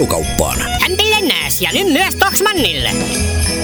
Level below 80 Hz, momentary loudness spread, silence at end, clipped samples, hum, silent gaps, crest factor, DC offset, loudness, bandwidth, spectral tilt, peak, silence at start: -26 dBFS; 4 LU; 0 s; under 0.1%; none; none; 14 dB; under 0.1%; -13 LUFS; over 20 kHz; -3 dB/octave; 0 dBFS; 0 s